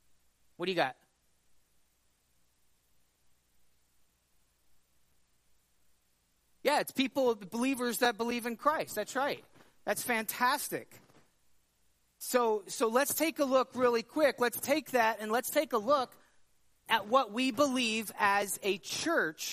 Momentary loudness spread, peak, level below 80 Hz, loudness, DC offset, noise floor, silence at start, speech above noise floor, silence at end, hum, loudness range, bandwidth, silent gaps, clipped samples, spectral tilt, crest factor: 6 LU; -12 dBFS; -78 dBFS; -31 LUFS; under 0.1%; -74 dBFS; 0.6 s; 43 dB; 0 s; 60 Hz at -80 dBFS; 8 LU; 15.5 kHz; none; under 0.1%; -2.5 dB/octave; 22 dB